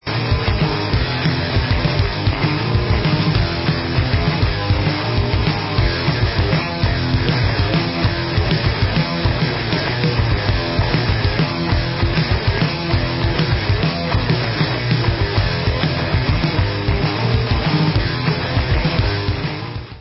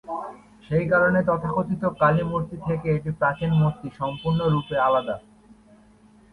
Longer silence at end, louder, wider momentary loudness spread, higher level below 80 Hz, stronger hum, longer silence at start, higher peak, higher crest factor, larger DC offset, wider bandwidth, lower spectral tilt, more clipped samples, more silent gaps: second, 0 s vs 1.15 s; first, -18 LUFS vs -23 LUFS; second, 2 LU vs 11 LU; first, -26 dBFS vs -50 dBFS; neither; about the same, 0.05 s vs 0.05 s; first, -2 dBFS vs -6 dBFS; about the same, 16 dB vs 18 dB; neither; first, 5.8 kHz vs 4.6 kHz; about the same, -10 dB/octave vs -9 dB/octave; neither; neither